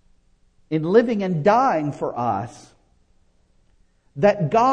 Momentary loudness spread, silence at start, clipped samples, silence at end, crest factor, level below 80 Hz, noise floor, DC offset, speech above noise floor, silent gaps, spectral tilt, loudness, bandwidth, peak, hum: 10 LU; 0.7 s; under 0.1%; 0 s; 20 dB; -56 dBFS; -59 dBFS; under 0.1%; 40 dB; none; -7.5 dB/octave; -20 LUFS; 9.4 kHz; -2 dBFS; none